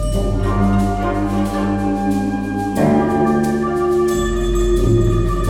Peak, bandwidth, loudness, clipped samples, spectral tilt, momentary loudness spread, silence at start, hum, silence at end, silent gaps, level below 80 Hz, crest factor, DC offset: -2 dBFS; 16 kHz; -17 LUFS; under 0.1%; -7 dB/octave; 4 LU; 0 s; none; 0 s; none; -24 dBFS; 14 dB; under 0.1%